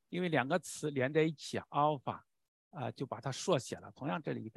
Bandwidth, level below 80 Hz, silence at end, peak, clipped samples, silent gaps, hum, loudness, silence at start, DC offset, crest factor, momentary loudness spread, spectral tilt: 12.5 kHz; -74 dBFS; 0.05 s; -14 dBFS; under 0.1%; 2.48-2.71 s; none; -36 LUFS; 0.1 s; under 0.1%; 22 dB; 11 LU; -5 dB/octave